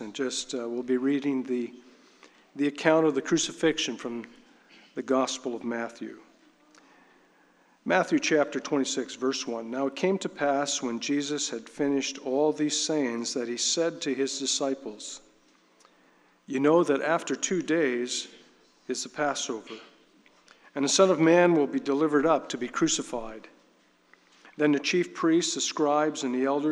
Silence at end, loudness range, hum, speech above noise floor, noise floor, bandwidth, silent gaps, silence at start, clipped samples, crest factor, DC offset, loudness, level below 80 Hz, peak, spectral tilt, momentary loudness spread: 0 s; 6 LU; none; 36 dB; -63 dBFS; 11.5 kHz; none; 0 s; under 0.1%; 22 dB; under 0.1%; -27 LUFS; -68 dBFS; -6 dBFS; -3.5 dB/octave; 14 LU